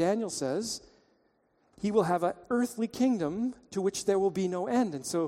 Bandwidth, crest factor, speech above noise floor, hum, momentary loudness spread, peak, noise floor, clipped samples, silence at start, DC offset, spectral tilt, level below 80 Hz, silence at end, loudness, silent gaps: 16 kHz; 18 dB; 41 dB; none; 6 LU; -12 dBFS; -70 dBFS; under 0.1%; 0 s; under 0.1%; -5 dB/octave; -68 dBFS; 0 s; -30 LUFS; none